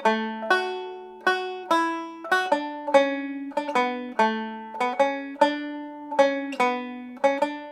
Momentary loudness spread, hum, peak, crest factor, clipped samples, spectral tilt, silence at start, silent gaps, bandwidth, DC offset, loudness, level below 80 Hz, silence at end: 10 LU; none; -4 dBFS; 22 dB; under 0.1%; -3.5 dB/octave; 0 s; none; 14.5 kHz; under 0.1%; -25 LUFS; -76 dBFS; 0 s